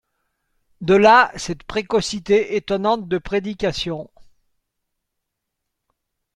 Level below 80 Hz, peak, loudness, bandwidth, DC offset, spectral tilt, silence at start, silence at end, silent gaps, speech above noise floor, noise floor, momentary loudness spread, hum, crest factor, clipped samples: -48 dBFS; -2 dBFS; -19 LUFS; 11 kHz; under 0.1%; -4.5 dB/octave; 0.8 s; 2.35 s; none; 61 dB; -79 dBFS; 15 LU; none; 20 dB; under 0.1%